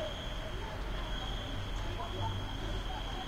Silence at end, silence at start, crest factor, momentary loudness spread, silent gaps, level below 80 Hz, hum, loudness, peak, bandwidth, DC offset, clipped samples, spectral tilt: 0 s; 0 s; 12 dB; 3 LU; none; -40 dBFS; none; -39 LUFS; -26 dBFS; 15.5 kHz; under 0.1%; under 0.1%; -5 dB/octave